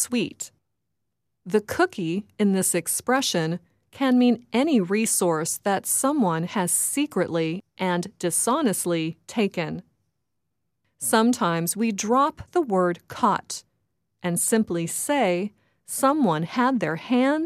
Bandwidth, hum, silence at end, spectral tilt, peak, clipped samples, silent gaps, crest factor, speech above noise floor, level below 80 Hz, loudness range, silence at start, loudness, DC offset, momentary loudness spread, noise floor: 16 kHz; none; 0 s; -4 dB/octave; -6 dBFS; under 0.1%; none; 18 dB; 58 dB; -64 dBFS; 3 LU; 0 s; -23 LUFS; under 0.1%; 8 LU; -81 dBFS